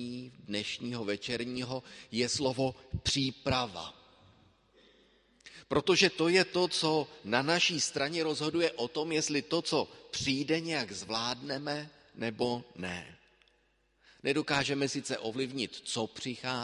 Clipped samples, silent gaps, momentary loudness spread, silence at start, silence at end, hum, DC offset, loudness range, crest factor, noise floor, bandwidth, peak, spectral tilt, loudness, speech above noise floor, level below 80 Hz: under 0.1%; none; 12 LU; 0 s; 0 s; none; under 0.1%; 7 LU; 24 dB; -72 dBFS; 11.5 kHz; -10 dBFS; -3.5 dB/octave; -32 LUFS; 39 dB; -58 dBFS